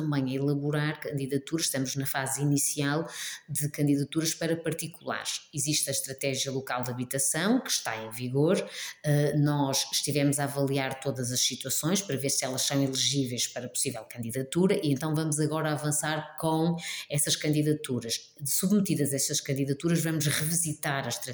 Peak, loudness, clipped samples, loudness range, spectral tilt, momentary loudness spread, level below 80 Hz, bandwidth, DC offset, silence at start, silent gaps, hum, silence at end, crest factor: -12 dBFS; -28 LUFS; under 0.1%; 2 LU; -4 dB/octave; 6 LU; -68 dBFS; over 20 kHz; under 0.1%; 0 s; none; none; 0 s; 16 dB